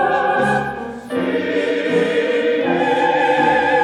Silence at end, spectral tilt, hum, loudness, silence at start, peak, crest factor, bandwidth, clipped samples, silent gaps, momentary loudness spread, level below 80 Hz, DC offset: 0 s; -5.5 dB/octave; none; -17 LUFS; 0 s; -4 dBFS; 12 dB; 11.5 kHz; under 0.1%; none; 7 LU; -52 dBFS; under 0.1%